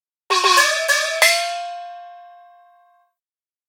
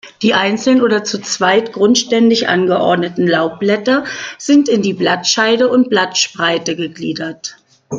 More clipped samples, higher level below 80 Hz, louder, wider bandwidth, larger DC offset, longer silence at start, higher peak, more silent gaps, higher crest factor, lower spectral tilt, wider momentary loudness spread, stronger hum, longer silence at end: neither; second, -84 dBFS vs -58 dBFS; about the same, -16 LUFS vs -14 LUFS; first, 17 kHz vs 9.2 kHz; neither; first, 0.3 s vs 0.05 s; about the same, 0 dBFS vs 0 dBFS; neither; first, 22 dB vs 12 dB; second, 3.5 dB/octave vs -3.5 dB/octave; first, 20 LU vs 10 LU; neither; first, 1.4 s vs 0 s